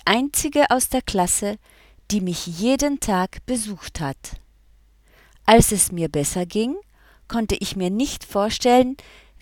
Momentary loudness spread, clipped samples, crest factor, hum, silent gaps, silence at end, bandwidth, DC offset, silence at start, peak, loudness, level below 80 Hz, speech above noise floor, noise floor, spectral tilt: 13 LU; under 0.1%; 22 dB; none; none; 0.4 s; 18.5 kHz; under 0.1%; 0.05 s; 0 dBFS; -21 LUFS; -40 dBFS; 33 dB; -54 dBFS; -4 dB/octave